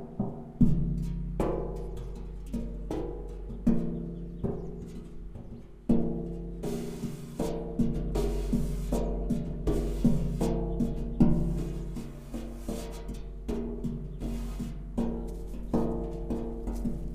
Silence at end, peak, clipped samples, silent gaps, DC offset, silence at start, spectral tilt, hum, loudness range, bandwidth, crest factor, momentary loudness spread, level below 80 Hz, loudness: 0 s; -10 dBFS; under 0.1%; none; under 0.1%; 0 s; -8.5 dB/octave; none; 6 LU; 15.5 kHz; 22 dB; 13 LU; -36 dBFS; -33 LUFS